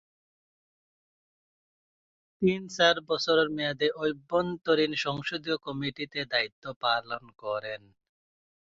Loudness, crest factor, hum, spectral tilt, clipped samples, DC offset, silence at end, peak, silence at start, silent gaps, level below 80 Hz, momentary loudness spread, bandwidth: -28 LUFS; 22 dB; none; -4.5 dB/octave; under 0.1%; under 0.1%; 0.95 s; -10 dBFS; 2.4 s; 6.52-6.62 s, 6.76-6.81 s; -66 dBFS; 10 LU; 7.8 kHz